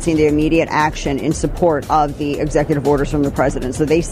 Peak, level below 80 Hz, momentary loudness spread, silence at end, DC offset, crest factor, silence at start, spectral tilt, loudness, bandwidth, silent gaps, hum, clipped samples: -2 dBFS; -30 dBFS; 5 LU; 0 s; under 0.1%; 14 dB; 0 s; -6 dB/octave; -17 LUFS; 15.5 kHz; none; none; under 0.1%